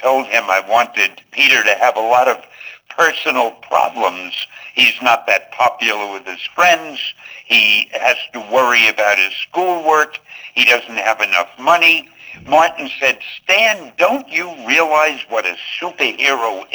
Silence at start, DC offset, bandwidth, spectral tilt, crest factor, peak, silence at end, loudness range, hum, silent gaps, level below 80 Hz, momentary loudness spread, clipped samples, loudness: 0 s; under 0.1%; over 20 kHz; -1 dB/octave; 16 dB; 0 dBFS; 0.1 s; 2 LU; none; none; -66 dBFS; 12 LU; under 0.1%; -14 LUFS